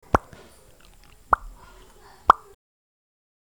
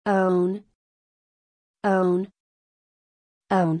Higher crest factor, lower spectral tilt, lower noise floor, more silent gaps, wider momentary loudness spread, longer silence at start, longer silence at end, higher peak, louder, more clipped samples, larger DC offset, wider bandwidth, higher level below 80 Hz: first, 28 dB vs 16 dB; second, -5.5 dB/octave vs -8.5 dB/octave; second, -53 dBFS vs under -90 dBFS; second, none vs 0.75-1.74 s, 2.40-3.41 s; second, 6 LU vs 10 LU; about the same, 0.15 s vs 0.05 s; first, 1.2 s vs 0 s; first, 0 dBFS vs -10 dBFS; about the same, -23 LUFS vs -23 LUFS; neither; first, 0.1% vs under 0.1%; first, 19.5 kHz vs 10 kHz; first, -44 dBFS vs -72 dBFS